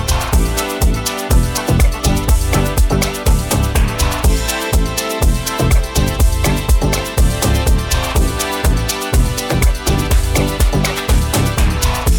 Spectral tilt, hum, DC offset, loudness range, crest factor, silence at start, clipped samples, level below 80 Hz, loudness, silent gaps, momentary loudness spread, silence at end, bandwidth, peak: -4.5 dB/octave; none; under 0.1%; 1 LU; 12 dB; 0 s; under 0.1%; -16 dBFS; -16 LUFS; none; 2 LU; 0 s; 19 kHz; -2 dBFS